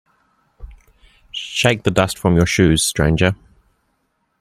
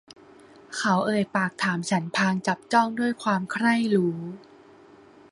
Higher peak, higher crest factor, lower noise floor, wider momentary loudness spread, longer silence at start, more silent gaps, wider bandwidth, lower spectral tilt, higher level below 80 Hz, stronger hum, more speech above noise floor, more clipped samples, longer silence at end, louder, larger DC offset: first, -2 dBFS vs -6 dBFS; about the same, 18 dB vs 20 dB; first, -68 dBFS vs -51 dBFS; first, 13 LU vs 7 LU; about the same, 0.6 s vs 0.7 s; neither; first, 15.5 kHz vs 11.5 kHz; about the same, -4.5 dB/octave vs -5 dB/octave; first, -36 dBFS vs -68 dBFS; neither; first, 52 dB vs 27 dB; neither; first, 1.05 s vs 0.9 s; first, -16 LUFS vs -24 LUFS; neither